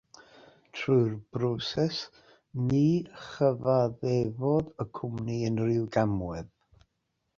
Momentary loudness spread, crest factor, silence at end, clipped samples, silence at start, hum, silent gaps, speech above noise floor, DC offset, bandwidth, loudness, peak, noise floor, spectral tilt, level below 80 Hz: 13 LU; 18 dB; 0.9 s; under 0.1%; 0.75 s; none; none; 51 dB; under 0.1%; 7.4 kHz; -29 LUFS; -12 dBFS; -79 dBFS; -7.5 dB/octave; -56 dBFS